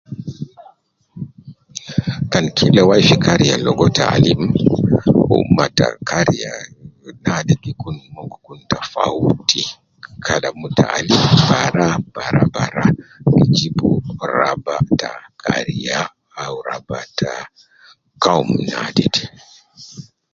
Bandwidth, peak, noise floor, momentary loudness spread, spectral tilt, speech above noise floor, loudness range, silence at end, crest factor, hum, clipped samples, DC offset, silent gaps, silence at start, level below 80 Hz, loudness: 7.6 kHz; 0 dBFS; -50 dBFS; 18 LU; -5.5 dB/octave; 34 dB; 8 LU; 0.3 s; 16 dB; none; under 0.1%; under 0.1%; none; 0.1 s; -42 dBFS; -16 LUFS